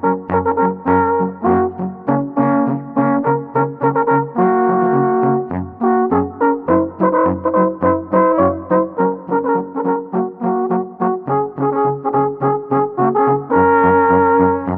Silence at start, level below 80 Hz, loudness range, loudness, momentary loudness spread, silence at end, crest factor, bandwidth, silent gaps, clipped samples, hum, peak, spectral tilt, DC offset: 0 s; -50 dBFS; 3 LU; -16 LUFS; 7 LU; 0 s; 16 dB; 3.5 kHz; none; under 0.1%; none; 0 dBFS; -12.5 dB/octave; under 0.1%